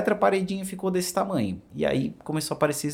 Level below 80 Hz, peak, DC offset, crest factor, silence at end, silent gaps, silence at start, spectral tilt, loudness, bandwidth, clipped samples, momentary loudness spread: -58 dBFS; -8 dBFS; under 0.1%; 18 dB; 0 s; none; 0 s; -5 dB/octave; -27 LUFS; 17 kHz; under 0.1%; 7 LU